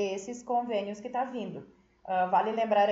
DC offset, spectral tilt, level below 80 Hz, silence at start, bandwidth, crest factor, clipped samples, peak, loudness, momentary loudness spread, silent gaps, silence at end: under 0.1%; -5 dB/octave; -72 dBFS; 0 s; 8 kHz; 16 dB; under 0.1%; -14 dBFS; -31 LUFS; 13 LU; none; 0 s